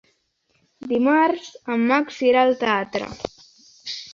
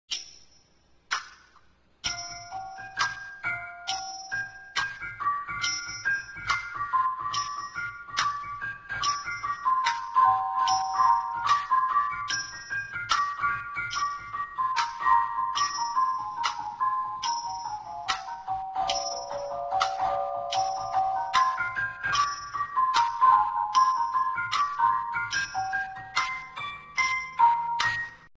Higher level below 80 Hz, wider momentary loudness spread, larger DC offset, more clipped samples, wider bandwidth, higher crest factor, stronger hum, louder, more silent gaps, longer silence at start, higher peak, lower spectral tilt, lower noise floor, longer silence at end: about the same, -60 dBFS vs -60 dBFS; first, 17 LU vs 11 LU; neither; neither; about the same, 7.4 kHz vs 8 kHz; about the same, 16 dB vs 20 dB; neither; first, -20 LUFS vs -28 LUFS; neither; first, 0.8 s vs 0.1 s; about the same, -6 dBFS vs -8 dBFS; first, -4.5 dB/octave vs -0.5 dB/octave; first, -68 dBFS vs -63 dBFS; about the same, 0 s vs 0.1 s